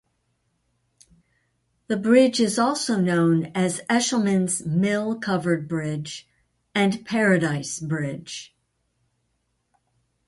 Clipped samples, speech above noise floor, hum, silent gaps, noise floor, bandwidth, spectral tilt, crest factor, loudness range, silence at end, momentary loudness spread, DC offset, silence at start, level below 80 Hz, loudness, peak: under 0.1%; 51 dB; none; none; -73 dBFS; 11.5 kHz; -5 dB/octave; 20 dB; 5 LU; 1.8 s; 11 LU; under 0.1%; 1.9 s; -64 dBFS; -22 LUFS; -4 dBFS